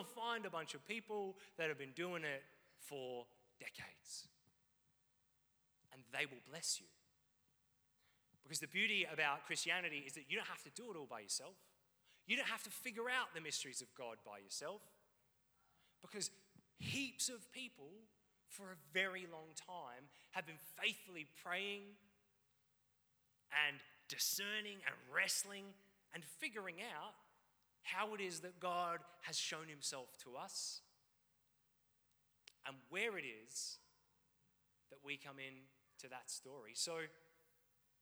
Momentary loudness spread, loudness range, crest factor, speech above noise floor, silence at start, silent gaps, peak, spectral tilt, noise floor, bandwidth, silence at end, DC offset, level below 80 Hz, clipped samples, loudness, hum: 16 LU; 9 LU; 26 dB; 28 dB; 0 s; none; -22 dBFS; -1.5 dB/octave; -75 dBFS; over 20 kHz; 0.75 s; under 0.1%; under -90 dBFS; under 0.1%; -45 LUFS; none